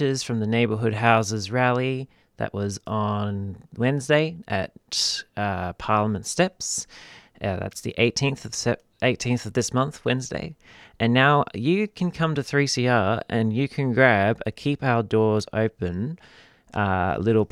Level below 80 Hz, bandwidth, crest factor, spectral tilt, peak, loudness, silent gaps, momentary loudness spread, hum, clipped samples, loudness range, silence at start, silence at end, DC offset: -54 dBFS; 14 kHz; 22 dB; -5 dB/octave; -2 dBFS; -24 LUFS; none; 10 LU; none; under 0.1%; 4 LU; 0 s; 0.05 s; under 0.1%